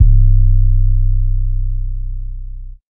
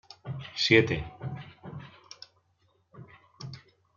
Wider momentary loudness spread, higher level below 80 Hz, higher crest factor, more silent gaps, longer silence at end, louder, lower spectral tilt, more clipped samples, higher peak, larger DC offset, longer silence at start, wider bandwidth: second, 17 LU vs 26 LU; first, -12 dBFS vs -58 dBFS; second, 12 dB vs 24 dB; first, 2.83-2.87 s vs none; second, 0 s vs 0.4 s; first, -17 LUFS vs -27 LUFS; first, -25.5 dB/octave vs -5 dB/octave; neither; first, 0 dBFS vs -8 dBFS; neither; second, 0 s vs 0.25 s; second, 0.3 kHz vs 7.2 kHz